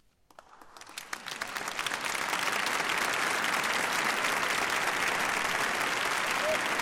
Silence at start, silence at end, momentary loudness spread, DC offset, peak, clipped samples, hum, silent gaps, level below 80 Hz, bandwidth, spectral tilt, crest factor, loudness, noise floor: 0.5 s; 0 s; 8 LU; under 0.1%; -16 dBFS; under 0.1%; none; none; -66 dBFS; 17 kHz; -1 dB/octave; 16 dB; -29 LUFS; -57 dBFS